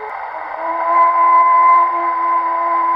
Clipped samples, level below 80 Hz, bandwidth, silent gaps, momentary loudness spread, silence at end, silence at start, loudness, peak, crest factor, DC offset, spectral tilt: under 0.1%; -62 dBFS; 5.2 kHz; none; 15 LU; 0 s; 0 s; -13 LUFS; -4 dBFS; 10 dB; under 0.1%; -4.5 dB/octave